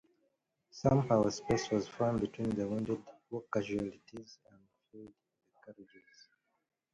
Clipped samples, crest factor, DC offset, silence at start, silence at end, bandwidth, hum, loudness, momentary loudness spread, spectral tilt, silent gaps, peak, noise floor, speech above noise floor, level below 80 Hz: under 0.1%; 22 dB; under 0.1%; 0.75 s; 1.1 s; 11 kHz; none; -34 LUFS; 24 LU; -6.5 dB/octave; none; -14 dBFS; -80 dBFS; 45 dB; -62 dBFS